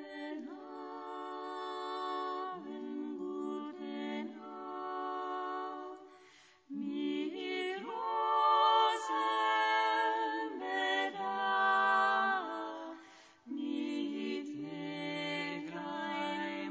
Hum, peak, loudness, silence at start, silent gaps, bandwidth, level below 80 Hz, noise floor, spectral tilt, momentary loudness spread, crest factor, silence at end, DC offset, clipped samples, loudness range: none; -18 dBFS; -35 LUFS; 0 s; none; 8 kHz; under -90 dBFS; -62 dBFS; -4 dB/octave; 16 LU; 18 dB; 0 s; under 0.1%; under 0.1%; 10 LU